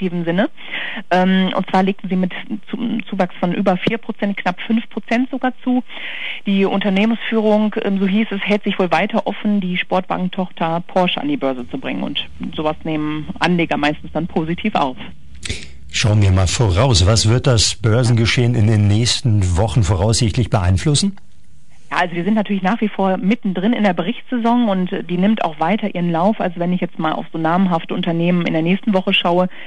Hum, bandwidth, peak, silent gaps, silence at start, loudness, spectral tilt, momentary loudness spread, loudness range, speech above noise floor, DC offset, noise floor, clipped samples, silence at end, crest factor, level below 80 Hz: none; 11 kHz; -2 dBFS; none; 0 s; -18 LUFS; -5.5 dB/octave; 8 LU; 6 LU; 34 dB; 3%; -51 dBFS; under 0.1%; 0 s; 16 dB; -40 dBFS